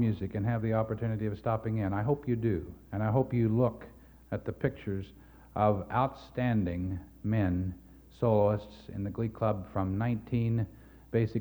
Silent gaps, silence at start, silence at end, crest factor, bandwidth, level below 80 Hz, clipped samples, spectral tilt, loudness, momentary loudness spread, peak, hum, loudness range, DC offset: none; 0 s; 0 s; 18 dB; over 20 kHz; -52 dBFS; under 0.1%; -10 dB/octave; -32 LUFS; 11 LU; -14 dBFS; none; 2 LU; under 0.1%